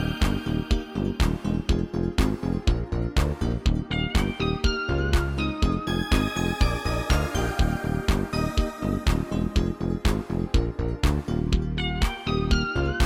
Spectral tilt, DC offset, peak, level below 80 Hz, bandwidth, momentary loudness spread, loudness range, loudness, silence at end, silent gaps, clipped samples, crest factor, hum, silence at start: -6 dB/octave; under 0.1%; -8 dBFS; -28 dBFS; 16.5 kHz; 3 LU; 1 LU; -26 LUFS; 0 s; none; under 0.1%; 16 dB; none; 0 s